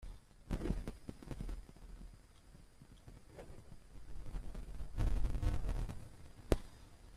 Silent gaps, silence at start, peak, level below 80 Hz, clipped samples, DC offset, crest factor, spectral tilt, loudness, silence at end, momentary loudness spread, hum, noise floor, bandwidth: none; 0 s; -14 dBFS; -44 dBFS; under 0.1%; under 0.1%; 28 dB; -7 dB/octave; -44 LUFS; 0 s; 20 LU; none; -60 dBFS; 14 kHz